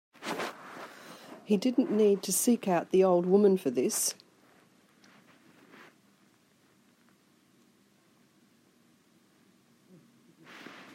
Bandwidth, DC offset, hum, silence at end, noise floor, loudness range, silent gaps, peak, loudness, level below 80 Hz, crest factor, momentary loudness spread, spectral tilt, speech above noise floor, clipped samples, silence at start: 16 kHz; under 0.1%; none; 0.15 s; -66 dBFS; 9 LU; none; -12 dBFS; -27 LUFS; -82 dBFS; 20 dB; 24 LU; -4.5 dB/octave; 40 dB; under 0.1%; 0.2 s